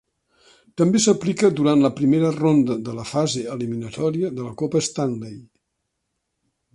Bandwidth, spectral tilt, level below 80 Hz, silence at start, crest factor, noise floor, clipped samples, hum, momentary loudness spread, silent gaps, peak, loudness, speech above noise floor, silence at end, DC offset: 11.5 kHz; -5.5 dB/octave; -60 dBFS; 0.75 s; 16 dB; -77 dBFS; under 0.1%; none; 10 LU; none; -6 dBFS; -21 LUFS; 57 dB; 1.3 s; under 0.1%